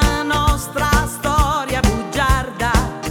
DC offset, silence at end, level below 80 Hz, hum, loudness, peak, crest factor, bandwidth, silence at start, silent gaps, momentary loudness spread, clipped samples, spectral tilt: under 0.1%; 0 s; -22 dBFS; none; -18 LUFS; -2 dBFS; 14 dB; 19 kHz; 0 s; none; 2 LU; under 0.1%; -4.5 dB/octave